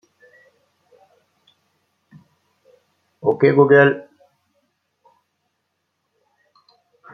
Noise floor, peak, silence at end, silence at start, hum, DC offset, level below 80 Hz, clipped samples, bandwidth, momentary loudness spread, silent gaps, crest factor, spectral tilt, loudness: -74 dBFS; -2 dBFS; 3.1 s; 3.25 s; none; under 0.1%; -68 dBFS; under 0.1%; 4.9 kHz; 12 LU; none; 20 dB; -9 dB/octave; -15 LUFS